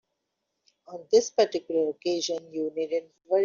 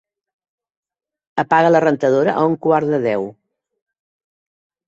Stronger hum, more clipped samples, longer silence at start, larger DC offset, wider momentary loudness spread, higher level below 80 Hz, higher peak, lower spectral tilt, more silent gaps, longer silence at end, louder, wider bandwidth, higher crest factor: neither; neither; second, 0.9 s vs 1.35 s; neither; about the same, 9 LU vs 11 LU; second, -74 dBFS vs -64 dBFS; second, -8 dBFS vs -2 dBFS; second, -2.5 dB/octave vs -7 dB/octave; neither; second, 0 s vs 1.55 s; second, -27 LUFS vs -16 LUFS; about the same, 7.4 kHz vs 7.8 kHz; about the same, 18 dB vs 18 dB